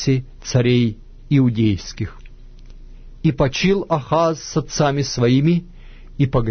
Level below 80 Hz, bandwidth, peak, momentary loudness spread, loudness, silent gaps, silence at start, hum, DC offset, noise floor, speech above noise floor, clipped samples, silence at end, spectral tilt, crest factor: -36 dBFS; 6.6 kHz; -4 dBFS; 9 LU; -19 LUFS; none; 0 s; none; under 0.1%; -38 dBFS; 21 dB; under 0.1%; 0 s; -6.5 dB/octave; 14 dB